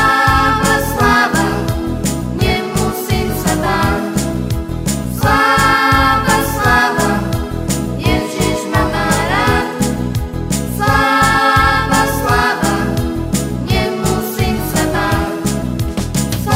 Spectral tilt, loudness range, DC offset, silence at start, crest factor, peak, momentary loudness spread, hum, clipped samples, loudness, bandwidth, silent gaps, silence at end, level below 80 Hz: -4.5 dB/octave; 4 LU; under 0.1%; 0 s; 14 dB; 0 dBFS; 8 LU; none; under 0.1%; -14 LUFS; 16.5 kHz; none; 0 s; -26 dBFS